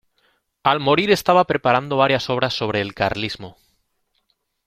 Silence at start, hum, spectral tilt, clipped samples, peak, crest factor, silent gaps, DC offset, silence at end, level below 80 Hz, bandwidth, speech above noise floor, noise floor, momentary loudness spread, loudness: 0.65 s; none; -5 dB/octave; under 0.1%; -2 dBFS; 20 dB; none; under 0.1%; 1.15 s; -52 dBFS; 16 kHz; 51 dB; -70 dBFS; 10 LU; -19 LUFS